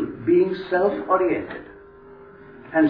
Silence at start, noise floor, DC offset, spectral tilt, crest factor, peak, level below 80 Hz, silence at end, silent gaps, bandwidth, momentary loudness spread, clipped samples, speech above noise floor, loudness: 0 s; -45 dBFS; under 0.1%; -10 dB/octave; 16 dB; -6 dBFS; -56 dBFS; 0 s; none; 5.2 kHz; 11 LU; under 0.1%; 24 dB; -21 LUFS